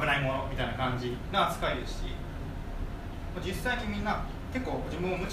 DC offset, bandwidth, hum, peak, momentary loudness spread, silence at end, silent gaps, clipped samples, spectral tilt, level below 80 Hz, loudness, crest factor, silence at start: under 0.1%; 15.5 kHz; none; -14 dBFS; 11 LU; 0 s; none; under 0.1%; -5.5 dB/octave; -40 dBFS; -33 LUFS; 18 dB; 0 s